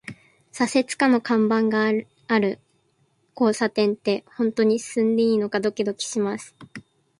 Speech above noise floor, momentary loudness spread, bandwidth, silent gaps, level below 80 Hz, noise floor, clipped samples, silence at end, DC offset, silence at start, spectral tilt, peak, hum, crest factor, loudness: 44 dB; 14 LU; 11.5 kHz; none; -68 dBFS; -66 dBFS; under 0.1%; 0.4 s; under 0.1%; 0.1 s; -5 dB/octave; -6 dBFS; none; 18 dB; -22 LUFS